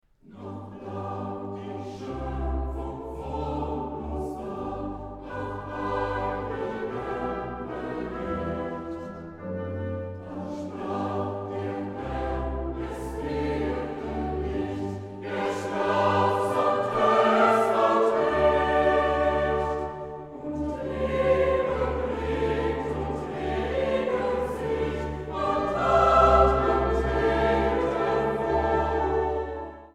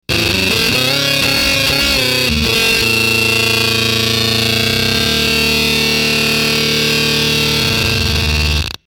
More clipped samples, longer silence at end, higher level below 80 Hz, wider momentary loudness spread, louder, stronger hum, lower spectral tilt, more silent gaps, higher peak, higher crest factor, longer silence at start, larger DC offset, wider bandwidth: neither; about the same, 0.05 s vs 0.1 s; second, -38 dBFS vs -28 dBFS; first, 14 LU vs 2 LU; second, -27 LUFS vs -12 LUFS; neither; first, -7 dB/octave vs -3 dB/octave; neither; about the same, -6 dBFS vs -4 dBFS; first, 20 dB vs 10 dB; first, 0.3 s vs 0.1 s; neither; second, 13 kHz vs over 20 kHz